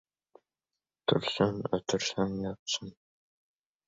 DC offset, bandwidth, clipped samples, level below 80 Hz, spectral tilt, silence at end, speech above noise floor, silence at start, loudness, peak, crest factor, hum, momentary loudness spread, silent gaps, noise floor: under 0.1%; 8 kHz; under 0.1%; -62 dBFS; -4.5 dB/octave; 0.95 s; over 59 dB; 1.1 s; -31 LUFS; -12 dBFS; 24 dB; none; 6 LU; 2.59-2.66 s; under -90 dBFS